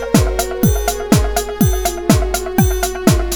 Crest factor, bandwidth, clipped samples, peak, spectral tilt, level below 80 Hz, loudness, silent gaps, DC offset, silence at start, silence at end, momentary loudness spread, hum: 14 dB; over 20 kHz; under 0.1%; 0 dBFS; -5 dB/octave; -22 dBFS; -16 LUFS; none; under 0.1%; 0 s; 0 s; 3 LU; none